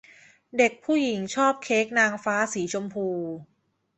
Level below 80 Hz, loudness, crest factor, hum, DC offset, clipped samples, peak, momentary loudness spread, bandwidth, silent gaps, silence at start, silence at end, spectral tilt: -70 dBFS; -25 LUFS; 18 dB; none; under 0.1%; under 0.1%; -8 dBFS; 10 LU; 8.4 kHz; none; 0.55 s; 0.55 s; -4 dB/octave